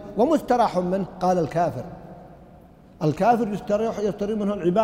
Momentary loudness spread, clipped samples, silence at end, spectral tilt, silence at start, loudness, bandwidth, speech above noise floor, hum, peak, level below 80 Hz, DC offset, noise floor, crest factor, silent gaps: 9 LU; under 0.1%; 0 s; -7.5 dB/octave; 0 s; -23 LUFS; 16 kHz; 26 dB; none; -8 dBFS; -52 dBFS; under 0.1%; -48 dBFS; 16 dB; none